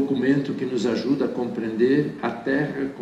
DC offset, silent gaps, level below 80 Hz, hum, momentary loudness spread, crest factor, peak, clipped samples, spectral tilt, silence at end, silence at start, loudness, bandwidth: under 0.1%; none; -60 dBFS; none; 7 LU; 14 dB; -8 dBFS; under 0.1%; -7 dB/octave; 0 s; 0 s; -23 LUFS; 8.6 kHz